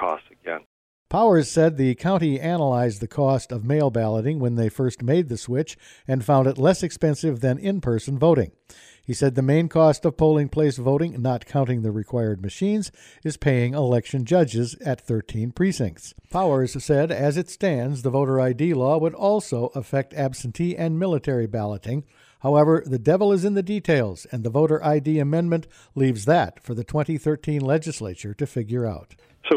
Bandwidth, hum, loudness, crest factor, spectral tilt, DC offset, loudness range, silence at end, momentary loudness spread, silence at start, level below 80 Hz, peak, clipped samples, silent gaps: 12.5 kHz; none; -22 LUFS; 16 dB; -7 dB/octave; under 0.1%; 3 LU; 0 s; 10 LU; 0 s; -50 dBFS; -6 dBFS; under 0.1%; 0.66-1.06 s